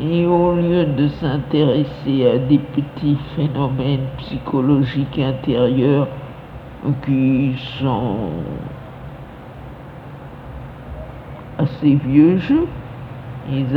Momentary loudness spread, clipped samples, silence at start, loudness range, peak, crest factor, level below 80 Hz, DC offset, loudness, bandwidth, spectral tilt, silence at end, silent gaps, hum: 20 LU; under 0.1%; 0 s; 9 LU; -2 dBFS; 18 dB; -40 dBFS; under 0.1%; -18 LUFS; 5.2 kHz; -10 dB/octave; 0 s; none; none